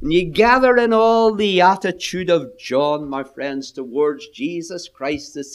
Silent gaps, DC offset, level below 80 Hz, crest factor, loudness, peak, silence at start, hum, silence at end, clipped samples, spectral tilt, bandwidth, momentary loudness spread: none; under 0.1%; -44 dBFS; 18 dB; -18 LUFS; 0 dBFS; 0 s; none; 0 s; under 0.1%; -5 dB/octave; 13 kHz; 13 LU